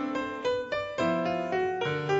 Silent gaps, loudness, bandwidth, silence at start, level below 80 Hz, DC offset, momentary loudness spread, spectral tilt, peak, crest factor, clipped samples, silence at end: none; -30 LUFS; 8 kHz; 0 s; -62 dBFS; under 0.1%; 3 LU; -6 dB/octave; -16 dBFS; 14 dB; under 0.1%; 0 s